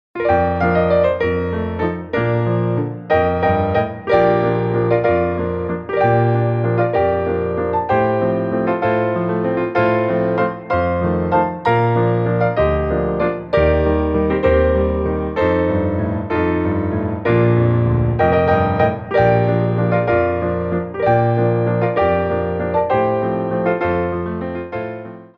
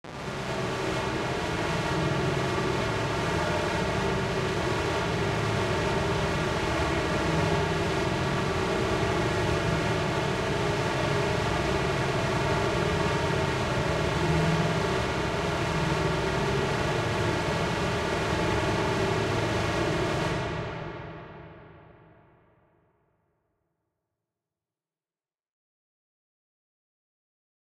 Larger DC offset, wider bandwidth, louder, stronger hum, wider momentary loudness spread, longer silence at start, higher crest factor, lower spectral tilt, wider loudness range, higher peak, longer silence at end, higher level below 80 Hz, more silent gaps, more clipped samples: neither; second, 5.4 kHz vs 15 kHz; first, -17 LUFS vs -27 LUFS; neither; first, 6 LU vs 3 LU; about the same, 0.15 s vs 0.05 s; about the same, 14 dB vs 16 dB; first, -10 dB/octave vs -5.5 dB/octave; about the same, 2 LU vs 3 LU; first, -2 dBFS vs -14 dBFS; second, 0.1 s vs 5.85 s; first, -34 dBFS vs -42 dBFS; neither; neither